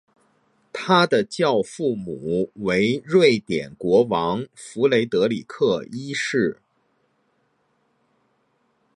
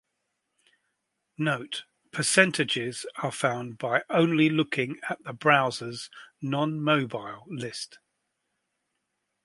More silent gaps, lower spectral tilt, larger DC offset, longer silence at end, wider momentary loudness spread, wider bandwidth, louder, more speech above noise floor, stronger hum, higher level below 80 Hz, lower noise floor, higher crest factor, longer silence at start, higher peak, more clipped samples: neither; first, -5.5 dB/octave vs -4 dB/octave; neither; first, 2.4 s vs 1.5 s; second, 11 LU vs 15 LU; about the same, 11 kHz vs 11.5 kHz; first, -21 LUFS vs -26 LUFS; second, 47 dB vs 53 dB; neither; first, -60 dBFS vs -74 dBFS; second, -67 dBFS vs -80 dBFS; about the same, 20 dB vs 24 dB; second, 0.75 s vs 1.4 s; about the same, -2 dBFS vs -4 dBFS; neither